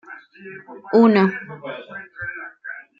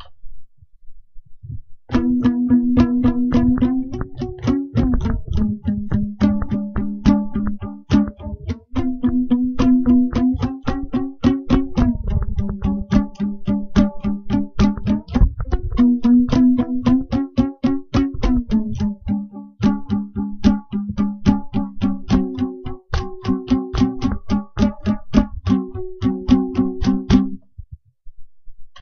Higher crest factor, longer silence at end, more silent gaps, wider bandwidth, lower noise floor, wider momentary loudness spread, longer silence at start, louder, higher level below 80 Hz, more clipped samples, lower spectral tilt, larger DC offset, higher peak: about the same, 18 dB vs 18 dB; first, 0.2 s vs 0 s; neither; second, 5.4 kHz vs 6.6 kHz; about the same, -38 dBFS vs -39 dBFS; first, 24 LU vs 10 LU; about the same, 0.1 s vs 0 s; about the same, -18 LUFS vs -20 LUFS; second, -64 dBFS vs -28 dBFS; neither; about the same, -8.5 dB/octave vs -8 dB/octave; neither; second, -4 dBFS vs 0 dBFS